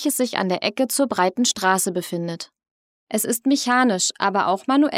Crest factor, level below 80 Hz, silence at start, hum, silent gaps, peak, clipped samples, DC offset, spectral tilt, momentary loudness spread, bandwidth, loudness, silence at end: 18 dB; -70 dBFS; 0 s; none; 2.71-3.07 s; -2 dBFS; under 0.1%; under 0.1%; -3 dB/octave; 9 LU; 16.5 kHz; -21 LUFS; 0 s